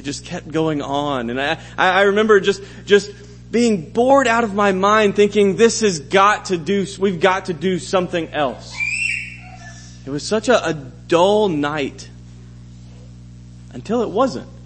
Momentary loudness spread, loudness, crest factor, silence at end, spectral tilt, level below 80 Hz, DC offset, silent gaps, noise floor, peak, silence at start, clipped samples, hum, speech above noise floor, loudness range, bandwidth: 14 LU; -17 LUFS; 18 dB; 0 s; -4.5 dB/octave; -46 dBFS; under 0.1%; none; -38 dBFS; 0 dBFS; 0 s; under 0.1%; 60 Hz at -40 dBFS; 21 dB; 6 LU; 8.8 kHz